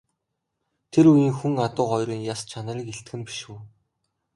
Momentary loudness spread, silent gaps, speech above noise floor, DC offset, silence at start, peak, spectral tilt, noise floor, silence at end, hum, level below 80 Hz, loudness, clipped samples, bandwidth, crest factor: 18 LU; none; 57 dB; under 0.1%; 0.95 s; -6 dBFS; -6.5 dB/octave; -80 dBFS; 0.7 s; none; -62 dBFS; -23 LUFS; under 0.1%; 11.5 kHz; 18 dB